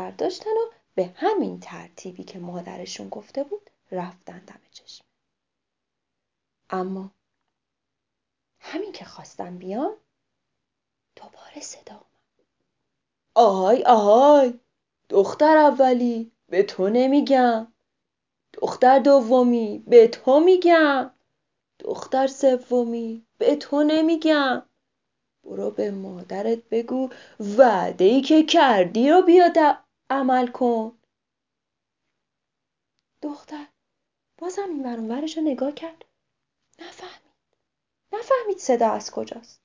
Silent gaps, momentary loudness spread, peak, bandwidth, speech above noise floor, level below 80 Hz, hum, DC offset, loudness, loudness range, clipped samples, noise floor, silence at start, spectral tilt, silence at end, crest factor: none; 21 LU; -2 dBFS; 7.6 kHz; 64 dB; -76 dBFS; none; under 0.1%; -20 LUFS; 19 LU; under 0.1%; -84 dBFS; 0 s; -5 dB/octave; 0.25 s; 20 dB